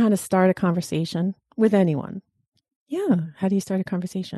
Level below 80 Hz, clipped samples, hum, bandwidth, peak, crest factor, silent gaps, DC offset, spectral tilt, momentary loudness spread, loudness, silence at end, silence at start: -64 dBFS; under 0.1%; none; 12.5 kHz; -8 dBFS; 16 dB; 2.48-2.52 s, 2.76-2.86 s; under 0.1%; -7 dB/octave; 9 LU; -23 LUFS; 0 s; 0 s